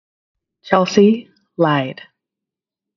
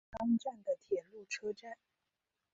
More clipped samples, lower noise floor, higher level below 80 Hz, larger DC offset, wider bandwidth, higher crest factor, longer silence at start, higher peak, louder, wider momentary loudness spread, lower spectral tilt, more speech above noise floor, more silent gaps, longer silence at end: neither; about the same, -86 dBFS vs -88 dBFS; first, -64 dBFS vs -70 dBFS; neither; about the same, 7.2 kHz vs 7.6 kHz; about the same, 18 dB vs 16 dB; first, 0.65 s vs 0.15 s; first, 0 dBFS vs -24 dBFS; first, -16 LUFS vs -39 LUFS; first, 19 LU vs 14 LU; about the same, -5 dB/octave vs -4.5 dB/octave; first, 71 dB vs 51 dB; neither; first, 1.05 s vs 0.8 s